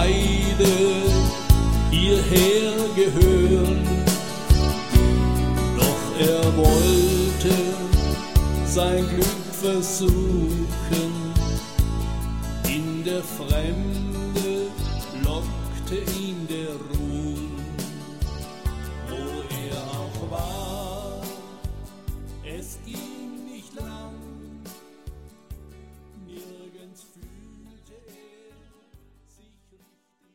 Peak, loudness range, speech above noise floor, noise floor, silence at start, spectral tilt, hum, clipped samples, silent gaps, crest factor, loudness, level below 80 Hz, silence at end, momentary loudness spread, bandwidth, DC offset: -2 dBFS; 19 LU; 41 dB; -65 dBFS; 0 s; -5.5 dB/octave; none; under 0.1%; none; 20 dB; -23 LUFS; -28 dBFS; 0 s; 19 LU; 16.5 kHz; 0.6%